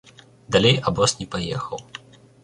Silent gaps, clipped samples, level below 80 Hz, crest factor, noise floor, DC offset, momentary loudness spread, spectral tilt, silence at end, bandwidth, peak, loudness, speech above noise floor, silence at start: none; under 0.1%; -48 dBFS; 22 dB; -43 dBFS; under 0.1%; 19 LU; -4 dB/octave; 0.45 s; 11.5 kHz; -2 dBFS; -21 LUFS; 22 dB; 0.5 s